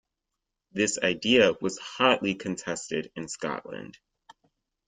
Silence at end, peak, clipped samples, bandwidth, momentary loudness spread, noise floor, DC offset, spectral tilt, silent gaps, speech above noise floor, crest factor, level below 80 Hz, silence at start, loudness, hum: 1 s; -6 dBFS; under 0.1%; 9.6 kHz; 17 LU; -85 dBFS; under 0.1%; -3.5 dB/octave; none; 57 dB; 22 dB; -66 dBFS; 0.75 s; -26 LUFS; none